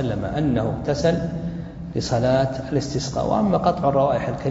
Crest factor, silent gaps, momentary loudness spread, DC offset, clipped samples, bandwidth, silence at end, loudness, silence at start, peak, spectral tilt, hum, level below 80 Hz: 16 dB; none; 9 LU; under 0.1%; under 0.1%; 8 kHz; 0 s; -22 LUFS; 0 s; -4 dBFS; -6.5 dB/octave; none; -40 dBFS